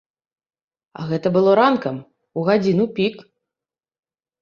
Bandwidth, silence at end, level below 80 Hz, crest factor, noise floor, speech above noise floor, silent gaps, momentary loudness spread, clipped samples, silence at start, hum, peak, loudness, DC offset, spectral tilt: 7 kHz; 1.2 s; -64 dBFS; 20 dB; under -90 dBFS; over 72 dB; none; 16 LU; under 0.1%; 1 s; none; -2 dBFS; -19 LUFS; under 0.1%; -8 dB/octave